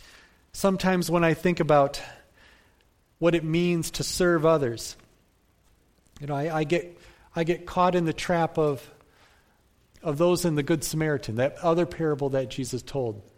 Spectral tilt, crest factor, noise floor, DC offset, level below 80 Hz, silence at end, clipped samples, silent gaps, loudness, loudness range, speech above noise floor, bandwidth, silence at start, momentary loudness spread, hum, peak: -5.5 dB/octave; 18 dB; -64 dBFS; under 0.1%; -50 dBFS; 0.15 s; under 0.1%; none; -25 LUFS; 3 LU; 39 dB; 16.5 kHz; 0.55 s; 11 LU; none; -8 dBFS